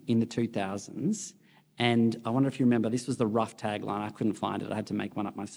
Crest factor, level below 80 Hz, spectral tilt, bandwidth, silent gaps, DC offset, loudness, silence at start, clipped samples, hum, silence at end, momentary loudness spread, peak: 18 dB; -72 dBFS; -6 dB/octave; over 20 kHz; none; under 0.1%; -30 LUFS; 0.05 s; under 0.1%; none; 0 s; 9 LU; -10 dBFS